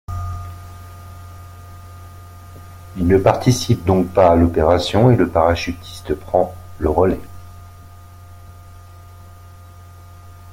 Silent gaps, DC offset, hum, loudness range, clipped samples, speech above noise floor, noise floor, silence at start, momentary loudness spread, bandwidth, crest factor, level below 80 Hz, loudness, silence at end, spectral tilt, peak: none; under 0.1%; none; 10 LU; under 0.1%; 25 dB; -40 dBFS; 0.1 s; 25 LU; 16.5 kHz; 18 dB; -38 dBFS; -17 LUFS; 0 s; -6.5 dB/octave; 0 dBFS